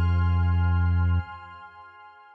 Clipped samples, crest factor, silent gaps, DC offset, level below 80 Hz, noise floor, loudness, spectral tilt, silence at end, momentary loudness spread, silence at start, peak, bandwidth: under 0.1%; 8 dB; none; under 0.1%; -34 dBFS; -49 dBFS; -24 LUFS; -9.5 dB/octave; 0.25 s; 20 LU; 0 s; -16 dBFS; 4.5 kHz